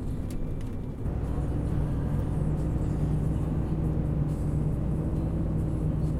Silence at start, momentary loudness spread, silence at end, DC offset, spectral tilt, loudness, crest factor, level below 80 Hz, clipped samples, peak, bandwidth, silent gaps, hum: 0 s; 6 LU; 0 s; under 0.1%; -9.5 dB/octave; -30 LUFS; 12 dB; -32 dBFS; under 0.1%; -16 dBFS; 11.5 kHz; none; none